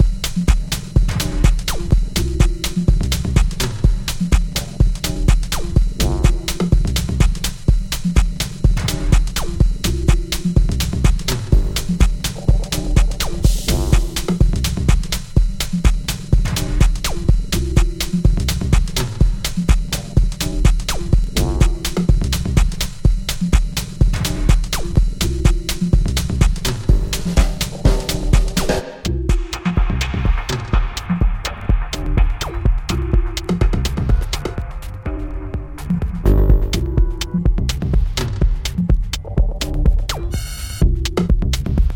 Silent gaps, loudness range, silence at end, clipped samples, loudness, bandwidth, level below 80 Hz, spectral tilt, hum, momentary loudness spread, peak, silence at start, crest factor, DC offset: none; 2 LU; 0 s; under 0.1%; -19 LUFS; 17.5 kHz; -18 dBFS; -5 dB/octave; none; 4 LU; 0 dBFS; 0 s; 16 dB; under 0.1%